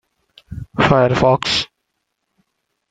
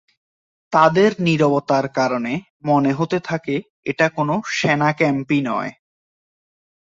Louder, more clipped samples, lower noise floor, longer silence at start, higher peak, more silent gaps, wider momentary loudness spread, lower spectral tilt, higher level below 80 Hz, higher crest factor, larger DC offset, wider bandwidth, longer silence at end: first, -15 LUFS vs -19 LUFS; neither; second, -74 dBFS vs under -90 dBFS; second, 0.5 s vs 0.7 s; about the same, 0 dBFS vs -2 dBFS; second, none vs 2.50-2.60 s, 3.70-3.83 s; first, 19 LU vs 10 LU; about the same, -5.5 dB/octave vs -6 dB/octave; first, -44 dBFS vs -60 dBFS; about the same, 20 dB vs 18 dB; neither; first, 9.2 kHz vs 7.8 kHz; first, 1.25 s vs 1.1 s